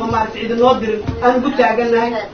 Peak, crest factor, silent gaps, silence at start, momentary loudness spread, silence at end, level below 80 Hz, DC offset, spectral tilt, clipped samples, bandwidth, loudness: 0 dBFS; 14 dB; none; 0 s; 5 LU; 0 s; -38 dBFS; under 0.1%; -6.5 dB/octave; under 0.1%; 6.6 kHz; -15 LUFS